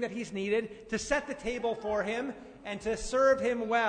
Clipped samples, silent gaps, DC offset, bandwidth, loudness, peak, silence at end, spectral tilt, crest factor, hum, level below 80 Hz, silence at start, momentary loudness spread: under 0.1%; none; under 0.1%; 9.6 kHz; -31 LUFS; -16 dBFS; 0 s; -4 dB/octave; 16 dB; none; -52 dBFS; 0 s; 11 LU